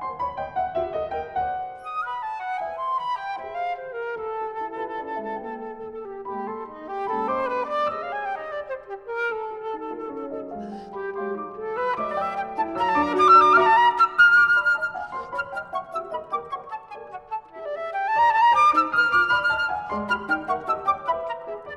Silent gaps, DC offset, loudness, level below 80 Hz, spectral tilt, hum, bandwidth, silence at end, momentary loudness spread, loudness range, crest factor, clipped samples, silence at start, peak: none; under 0.1%; -23 LUFS; -58 dBFS; -4.5 dB/octave; none; 12 kHz; 0 s; 18 LU; 14 LU; 20 dB; under 0.1%; 0 s; -4 dBFS